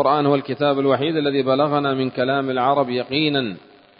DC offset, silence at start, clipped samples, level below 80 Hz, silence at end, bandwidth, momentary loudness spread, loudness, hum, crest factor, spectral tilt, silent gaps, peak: under 0.1%; 0 s; under 0.1%; -62 dBFS; 0.4 s; 5.4 kHz; 3 LU; -20 LUFS; none; 16 dB; -11 dB/octave; none; -2 dBFS